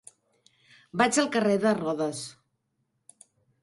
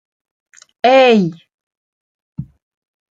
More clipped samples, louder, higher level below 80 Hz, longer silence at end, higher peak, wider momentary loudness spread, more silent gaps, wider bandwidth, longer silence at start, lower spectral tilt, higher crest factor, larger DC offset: neither; second, -26 LUFS vs -12 LUFS; second, -70 dBFS vs -56 dBFS; first, 1.3 s vs 0.7 s; second, -8 dBFS vs -2 dBFS; second, 14 LU vs 23 LU; second, none vs 1.54-1.71 s, 1.77-2.33 s; first, 11.5 kHz vs 7.8 kHz; about the same, 0.95 s vs 0.85 s; second, -4 dB/octave vs -6 dB/octave; about the same, 20 dB vs 16 dB; neither